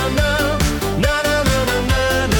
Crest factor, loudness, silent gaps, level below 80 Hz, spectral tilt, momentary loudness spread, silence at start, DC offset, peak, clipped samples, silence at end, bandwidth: 14 dB; -17 LUFS; none; -24 dBFS; -4.5 dB/octave; 2 LU; 0 s; under 0.1%; -2 dBFS; under 0.1%; 0 s; 19 kHz